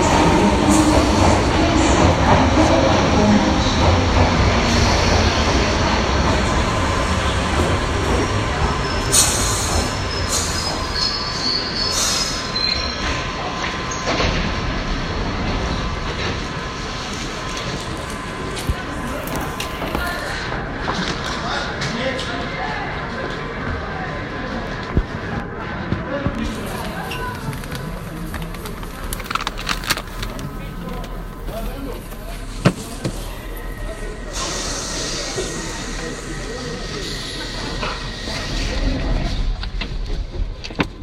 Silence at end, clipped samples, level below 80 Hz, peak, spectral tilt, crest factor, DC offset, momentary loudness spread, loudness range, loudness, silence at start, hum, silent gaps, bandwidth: 0 s; under 0.1%; -28 dBFS; 0 dBFS; -4 dB/octave; 20 dB; under 0.1%; 14 LU; 11 LU; -20 LUFS; 0 s; none; none; 16 kHz